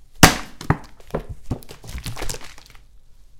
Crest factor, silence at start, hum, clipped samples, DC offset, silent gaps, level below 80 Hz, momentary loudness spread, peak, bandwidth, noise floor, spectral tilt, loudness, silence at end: 24 dB; 0 s; none; under 0.1%; under 0.1%; none; -34 dBFS; 20 LU; 0 dBFS; 17 kHz; -44 dBFS; -3.5 dB/octave; -22 LUFS; 0 s